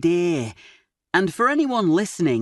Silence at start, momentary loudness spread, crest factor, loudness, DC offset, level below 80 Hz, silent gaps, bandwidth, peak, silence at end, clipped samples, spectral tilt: 0 s; 6 LU; 16 dB; -21 LUFS; under 0.1%; -62 dBFS; none; 12 kHz; -6 dBFS; 0 s; under 0.1%; -5.5 dB/octave